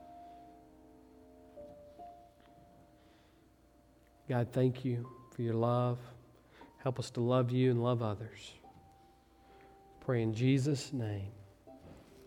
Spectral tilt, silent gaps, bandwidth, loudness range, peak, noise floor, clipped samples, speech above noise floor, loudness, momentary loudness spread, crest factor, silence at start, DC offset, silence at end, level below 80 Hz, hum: -7.5 dB/octave; none; 11.5 kHz; 6 LU; -18 dBFS; -65 dBFS; under 0.1%; 32 dB; -34 LUFS; 25 LU; 20 dB; 0 s; under 0.1%; 0.25 s; -68 dBFS; none